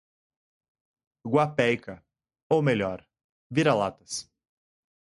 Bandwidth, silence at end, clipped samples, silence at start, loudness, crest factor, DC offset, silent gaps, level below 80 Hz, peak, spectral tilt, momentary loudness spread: 11.5 kHz; 0.8 s; under 0.1%; 1.25 s; -26 LUFS; 20 dB; under 0.1%; 2.42-2.50 s, 3.24-3.50 s; -62 dBFS; -8 dBFS; -5.5 dB/octave; 14 LU